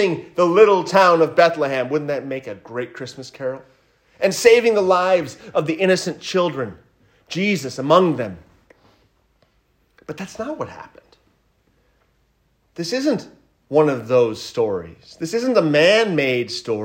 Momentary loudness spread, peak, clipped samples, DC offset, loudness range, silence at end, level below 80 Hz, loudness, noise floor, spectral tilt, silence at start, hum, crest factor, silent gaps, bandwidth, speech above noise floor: 17 LU; 0 dBFS; under 0.1%; under 0.1%; 17 LU; 0 s; -62 dBFS; -18 LUFS; -63 dBFS; -5 dB/octave; 0 s; none; 20 dB; none; 16 kHz; 45 dB